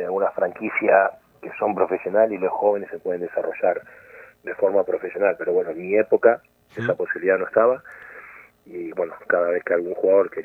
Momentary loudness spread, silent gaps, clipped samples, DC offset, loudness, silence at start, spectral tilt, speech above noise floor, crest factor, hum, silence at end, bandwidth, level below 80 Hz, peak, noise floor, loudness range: 16 LU; none; under 0.1%; under 0.1%; -22 LUFS; 0 s; -8.5 dB/octave; 23 dB; 20 dB; none; 0 s; 3.8 kHz; -70 dBFS; -2 dBFS; -45 dBFS; 3 LU